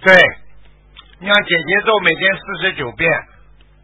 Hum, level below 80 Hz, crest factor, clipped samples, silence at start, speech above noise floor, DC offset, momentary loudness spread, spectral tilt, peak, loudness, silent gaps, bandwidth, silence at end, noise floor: none; -46 dBFS; 16 dB; 0.1%; 0 s; 32 dB; under 0.1%; 9 LU; -4.5 dB/octave; 0 dBFS; -14 LUFS; none; 8 kHz; 0.6 s; -46 dBFS